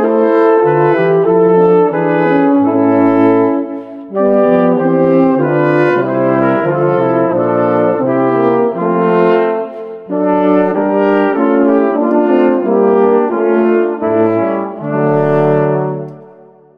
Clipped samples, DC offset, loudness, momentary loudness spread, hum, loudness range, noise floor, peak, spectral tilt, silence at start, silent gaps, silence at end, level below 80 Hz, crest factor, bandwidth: under 0.1%; under 0.1%; -12 LUFS; 6 LU; none; 2 LU; -40 dBFS; 0 dBFS; -10 dB/octave; 0 s; none; 0.55 s; -56 dBFS; 12 dB; 5.2 kHz